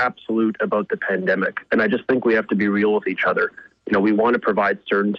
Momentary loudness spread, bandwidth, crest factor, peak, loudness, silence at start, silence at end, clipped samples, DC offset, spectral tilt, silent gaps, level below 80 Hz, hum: 4 LU; 6 kHz; 12 dB; -8 dBFS; -20 LUFS; 0 s; 0 s; under 0.1%; under 0.1%; -8.5 dB/octave; none; -62 dBFS; none